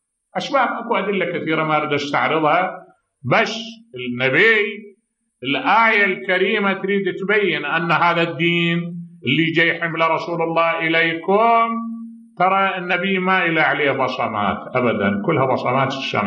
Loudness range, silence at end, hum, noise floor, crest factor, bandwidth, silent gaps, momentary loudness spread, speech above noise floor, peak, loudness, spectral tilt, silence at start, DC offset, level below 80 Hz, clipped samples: 2 LU; 0 s; none; -57 dBFS; 16 dB; 8 kHz; none; 12 LU; 39 dB; -2 dBFS; -18 LUFS; -6 dB/octave; 0.35 s; under 0.1%; -66 dBFS; under 0.1%